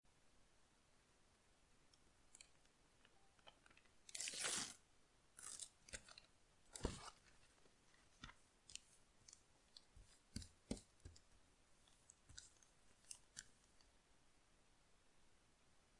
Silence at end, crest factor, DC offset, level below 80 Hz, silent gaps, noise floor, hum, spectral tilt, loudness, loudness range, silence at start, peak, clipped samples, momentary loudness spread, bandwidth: 0 s; 32 dB; under 0.1%; -70 dBFS; none; -76 dBFS; none; -2 dB/octave; -53 LUFS; 13 LU; 0.05 s; -26 dBFS; under 0.1%; 21 LU; 12 kHz